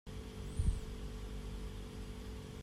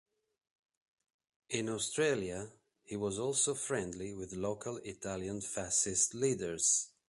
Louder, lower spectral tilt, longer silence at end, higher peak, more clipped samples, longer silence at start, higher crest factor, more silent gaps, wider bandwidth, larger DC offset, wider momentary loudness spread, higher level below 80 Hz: second, -45 LUFS vs -34 LUFS; first, -6 dB/octave vs -3 dB/octave; second, 0 s vs 0.2 s; second, -22 dBFS vs -18 dBFS; neither; second, 0.05 s vs 1.5 s; about the same, 20 dB vs 20 dB; neither; first, 14 kHz vs 11.5 kHz; neither; second, 9 LU vs 13 LU; first, -44 dBFS vs -64 dBFS